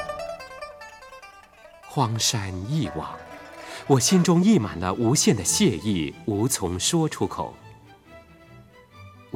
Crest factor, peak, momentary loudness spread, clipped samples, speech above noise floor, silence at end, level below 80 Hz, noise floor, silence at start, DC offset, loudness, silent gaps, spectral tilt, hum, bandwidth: 20 dB; -6 dBFS; 21 LU; under 0.1%; 27 dB; 0 s; -52 dBFS; -49 dBFS; 0 s; under 0.1%; -23 LUFS; none; -4.5 dB/octave; none; 17 kHz